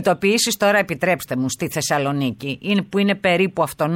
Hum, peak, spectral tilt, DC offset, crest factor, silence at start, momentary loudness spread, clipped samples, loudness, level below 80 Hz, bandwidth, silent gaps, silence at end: none; -4 dBFS; -4 dB/octave; under 0.1%; 14 dB; 0 s; 6 LU; under 0.1%; -19 LUFS; -56 dBFS; 17 kHz; none; 0 s